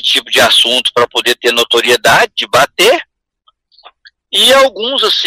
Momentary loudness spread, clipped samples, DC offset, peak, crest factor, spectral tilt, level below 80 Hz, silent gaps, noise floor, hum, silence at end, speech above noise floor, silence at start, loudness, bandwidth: 5 LU; under 0.1%; under 0.1%; 0 dBFS; 12 dB; -1 dB/octave; -50 dBFS; none; -57 dBFS; none; 0 s; 46 dB; 0.05 s; -9 LUFS; 16.5 kHz